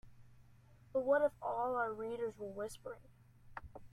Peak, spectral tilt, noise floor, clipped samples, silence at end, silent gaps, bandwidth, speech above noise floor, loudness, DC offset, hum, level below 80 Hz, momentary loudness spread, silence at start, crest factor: -22 dBFS; -5.5 dB/octave; -63 dBFS; under 0.1%; 0.05 s; none; 13.5 kHz; 24 dB; -38 LUFS; under 0.1%; none; -66 dBFS; 20 LU; 0.05 s; 18 dB